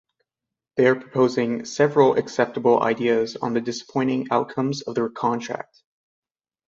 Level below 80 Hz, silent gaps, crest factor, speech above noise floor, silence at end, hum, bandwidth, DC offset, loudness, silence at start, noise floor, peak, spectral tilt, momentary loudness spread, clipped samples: -66 dBFS; none; 20 dB; 65 dB; 1.05 s; none; 7.8 kHz; under 0.1%; -22 LUFS; 0.75 s; -87 dBFS; -4 dBFS; -6 dB/octave; 8 LU; under 0.1%